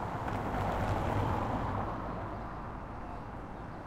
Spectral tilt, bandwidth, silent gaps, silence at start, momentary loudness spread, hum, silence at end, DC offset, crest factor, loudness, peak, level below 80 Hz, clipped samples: -7.5 dB/octave; 15.5 kHz; none; 0 s; 11 LU; none; 0 s; under 0.1%; 16 dB; -36 LUFS; -20 dBFS; -44 dBFS; under 0.1%